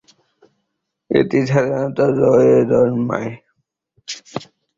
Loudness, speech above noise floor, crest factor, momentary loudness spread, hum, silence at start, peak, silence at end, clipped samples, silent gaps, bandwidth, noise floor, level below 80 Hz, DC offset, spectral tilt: -16 LUFS; 60 dB; 16 dB; 18 LU; none; 1.1 s; -2 dBFS; 0.35 s; under 0.1%; none; 7.6 kHz; -75 dBFS; -54 dBFS; under 0.1%; -7 dB/octave